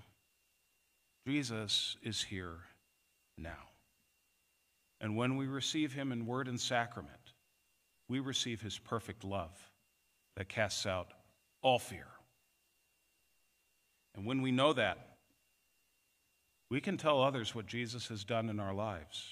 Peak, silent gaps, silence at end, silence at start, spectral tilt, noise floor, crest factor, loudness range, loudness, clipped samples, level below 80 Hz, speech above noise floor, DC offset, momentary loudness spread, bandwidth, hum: -16 dBFS; none; 0 s; 1.25 s; -4.5 dB/octave; -77 dBFS; 24 dB; 5 LU; -37 LUFS; under 0.1%; -72 dBFS; 40 dB; under 0.1%; 18 LU; 15.5 kHz; none